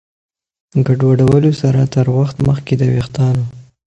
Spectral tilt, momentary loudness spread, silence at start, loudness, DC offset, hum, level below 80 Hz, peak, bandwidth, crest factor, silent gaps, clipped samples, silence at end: -8.5 dB/octave; 7 LU; 0.75 s; -14 LUFS; under 0.1%; none; -40 dBFS; 0 dBFS; 8.2 kHz; 14 dB; none; under 0.1%; 0.35 s